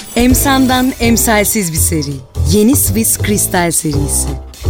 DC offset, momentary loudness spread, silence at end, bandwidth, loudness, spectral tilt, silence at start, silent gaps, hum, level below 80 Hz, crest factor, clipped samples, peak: under 0.1%; 5 LU; 0 s; 17 kHz; -12 LUFS; -4 dB/octave; 0 s; none; none; -24 dBFS; 12 dB; under 0.1%; 0 dBFS